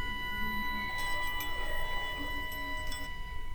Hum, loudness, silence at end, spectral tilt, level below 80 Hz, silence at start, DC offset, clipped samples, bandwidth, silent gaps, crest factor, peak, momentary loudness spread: none; -36 LUFS; 0 s; -3 dB/octave; -40 dBFS; 0 s; under 0.1%; under 0.1%; over 20 kHz; none; 12 dB; -22 dBFS; 5 LU